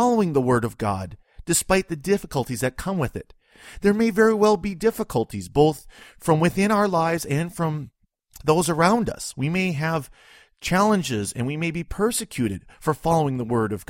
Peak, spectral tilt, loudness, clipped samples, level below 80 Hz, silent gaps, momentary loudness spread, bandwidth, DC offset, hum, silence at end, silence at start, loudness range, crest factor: -4 dBFS; -5.5 dB/octave; -23 LUFS; under 0.1%; -46 dBFS; none; 9 LU; 16.5 kHz; under 0.1%; none; 0.05 s; 0 s; 3 LU; 18 dB